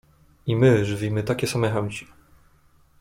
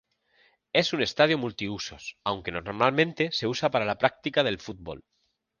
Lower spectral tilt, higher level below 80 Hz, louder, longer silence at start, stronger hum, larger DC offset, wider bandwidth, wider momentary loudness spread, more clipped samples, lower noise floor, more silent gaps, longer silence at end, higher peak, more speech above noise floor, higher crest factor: first, -6.5 dB/octave vs -4.5 dB/octave; first, -52 dBFS vs -58 dBFS; first, -23 LUFS vs -27 LUFS; second, 0.45 s vs 0.75 s; neither; neither; first, 16 kHz vs 9.8 kHz; about the same, 14 LU vs 13 LU; neither; second, -58 dBFS vs -65 dBFS; neither; first, 0.95 s vs 0.6 s; about the same, -6 dBFS vs -4 dBFS; about the same, 36 dB vs 38 dB; second, 18 dB vs 24 dB